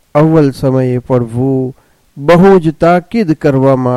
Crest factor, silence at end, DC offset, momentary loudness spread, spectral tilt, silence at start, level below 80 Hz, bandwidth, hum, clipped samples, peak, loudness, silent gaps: 10 dB; 0 s; under 0.1%; 7 LU; -8.5 dB/octave; 0.15 s; -38 dBFS; 13 kHz; none; under 0.1%; 0 dBFS; -10 LUFS; none